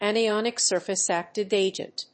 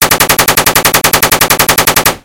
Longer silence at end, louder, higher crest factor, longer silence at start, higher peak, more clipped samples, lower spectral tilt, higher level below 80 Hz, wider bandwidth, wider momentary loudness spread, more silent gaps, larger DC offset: about the same, 0.1 s vs 0.05 s; second, -25 LUFS vs -6 LUFS; first, 16 dB vs 8 dB; about the same, 0 s vs 0 s; second, -10 dBFS vs 0 dBFS; second, under 0.1% vs 4%; about the same, -2 dB/octave vs -1.5 dB/octave; second, -76 dBFS vs -32 dBFS; second, 8.8 kHz vs over 20 kHz; first, 5 LU vs 1 LU; neither; second, under 0.1% vs 0.8%